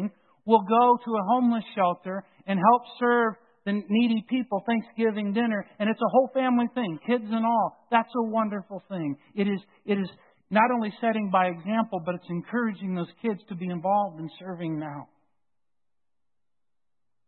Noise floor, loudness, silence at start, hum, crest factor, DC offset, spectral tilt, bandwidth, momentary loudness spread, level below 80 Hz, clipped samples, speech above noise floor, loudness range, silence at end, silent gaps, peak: -90 dBFS; -26 LUFS; 0 s; none; 20 dB; under 0.1%; -11 dB/octave; 4.4 kHz; 12 LU; -76 dBFS; under 0.1%; 64 dB; 7 LU; 2.25 s; none; -6 dBFS